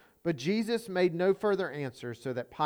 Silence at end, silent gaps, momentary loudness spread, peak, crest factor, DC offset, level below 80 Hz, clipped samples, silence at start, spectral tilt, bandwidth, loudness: 0 s; none; 10 LU; -16 dBFS; 16 dB; under 0.1%; -70 dBFS; under 0.1%; 0.25 s; -6 dB/octave; over 20 kHz; -31 LUFS